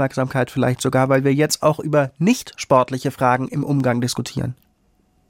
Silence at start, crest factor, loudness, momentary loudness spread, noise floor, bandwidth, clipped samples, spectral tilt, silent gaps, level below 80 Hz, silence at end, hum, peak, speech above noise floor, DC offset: 0 s; 18 dB; -19 LUFS; 6 LU; -61 dBFS; 17 kHz; under 0.1%; -5.5 dB/octave; none; -54 dBFS; 0.75 s; none; -2 dBFS; 42 dB; under 0.1%